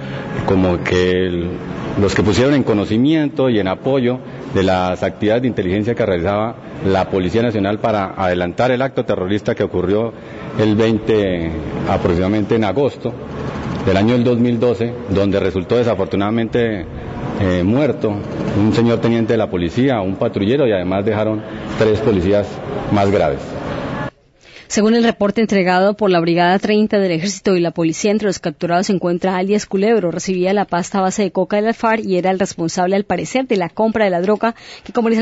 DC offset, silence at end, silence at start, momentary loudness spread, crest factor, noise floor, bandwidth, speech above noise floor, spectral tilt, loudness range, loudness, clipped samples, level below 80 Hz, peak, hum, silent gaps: under 0.1%; 0 s; 0 s; 8 LU; 14 dB; -44 dBFS; 8 kHz; 28 dB; -6 dB/octave; 2 LU; -17 LUFS; under 0.1%; -44 dBFS; -2 dBFS; none; none